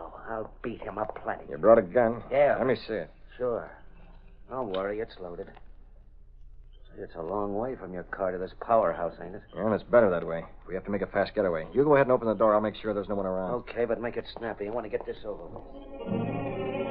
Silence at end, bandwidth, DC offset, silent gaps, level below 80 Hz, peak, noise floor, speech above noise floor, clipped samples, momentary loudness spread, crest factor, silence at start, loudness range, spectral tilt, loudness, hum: 0 s; 5.2 kHz; under 0.1%; none; -50 dBFS; -6 dBFS; -50 dBFS; 22 dB; under 0.1%; 17 LU; 22 dB; 0 s; 11 LU; -5.5 dB/octave; -29 LUFS; none